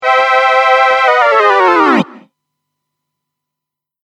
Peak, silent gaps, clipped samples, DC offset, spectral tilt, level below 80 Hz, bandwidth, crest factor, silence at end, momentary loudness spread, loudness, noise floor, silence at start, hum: 0 dBFS; none; under 0.1%; under 0.1%; -4.5 dB/octave; -66 dBFS; 10.5 kHz; 12 dB; 1.9 s; 3 LU; -9 LUFS; -82 dBFS; 0 s; none